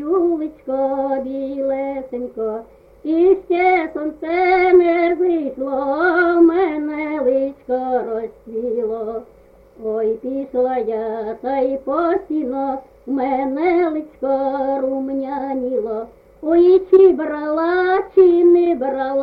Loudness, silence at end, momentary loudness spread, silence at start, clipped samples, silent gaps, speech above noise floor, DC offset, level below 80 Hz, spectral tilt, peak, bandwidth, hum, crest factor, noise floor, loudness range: -18 LUFS; 0 s; 13 LU; 0 s; under 0.1%; none; 30 dB; under 0.1%; -52 dBFS; -7.5 dB/octave; -2 dBFS; 5 kHz; none; 16 dB; -47 dBFS; 7 LU